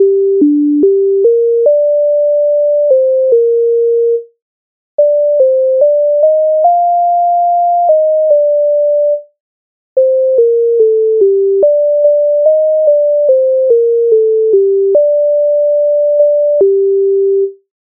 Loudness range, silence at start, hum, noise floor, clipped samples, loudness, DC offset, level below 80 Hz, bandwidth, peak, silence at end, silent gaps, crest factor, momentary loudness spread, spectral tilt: 2 LU; 0 s; none; under -90 dBFS; under 0.1%; -10 LUFS; under 0.1%; -70 dBFS; 1 kHz; 0 dBFS; 0.4 s; 4.42-4.98 s, 9.40-9.96 s; 8 dB; 2 LU; -6 dB/octave